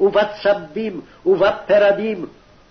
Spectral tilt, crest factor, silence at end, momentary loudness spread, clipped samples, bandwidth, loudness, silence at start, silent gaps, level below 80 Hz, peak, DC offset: -6.5 dB/octave; 12 dB; 0.4 s; 13 LU; under 0.1%; 6.4 kHz; -18 LUFS; 0 s; none; -52 dBFS; -6 dBFS; under 0.1%